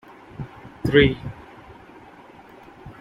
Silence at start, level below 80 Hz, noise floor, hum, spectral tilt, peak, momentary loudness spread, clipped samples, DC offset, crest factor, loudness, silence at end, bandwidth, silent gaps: 0.4 s; -44 dBFS; -46 dBFS; none; -7.5 dB/octave; -4 dBFS; 28 LU; under 0.1%; under 0.1%; 22 dB; -20 LUFS; 0.1 s; 12 kHz; none